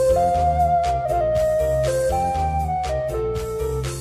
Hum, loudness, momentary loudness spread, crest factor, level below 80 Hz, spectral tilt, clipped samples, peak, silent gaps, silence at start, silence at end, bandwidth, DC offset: none; -21 LUFS; 7 LU; 12 dB; -32 dBFS; -6 dB/octave; under 0.1%; -8 dBFS; none; 0 s; 0 s; 15 kHz; under 0.1%